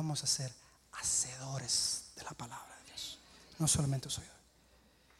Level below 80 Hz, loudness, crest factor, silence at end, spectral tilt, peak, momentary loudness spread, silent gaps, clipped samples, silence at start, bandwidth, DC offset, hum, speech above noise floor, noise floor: -62 dBFS; -35 LUFS; 22 dB; 0.8 s; -2.5 dB/octave; -18 dBFS; 18 LU; none; under 0.1%; 0 s; 16 kHz; under 0.1%; none; 30 dB; -66 dBFS